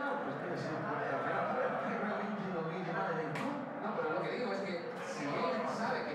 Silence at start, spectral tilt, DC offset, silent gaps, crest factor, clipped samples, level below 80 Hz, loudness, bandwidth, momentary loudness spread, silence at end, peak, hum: 0 s; -6 dB/octave; under 0.1%; none; 14 dB; under 0.1%; -82 dBFS; -37 LUFS; 12.5 kHz; 4 LU; 0 s; -22 dBFS; none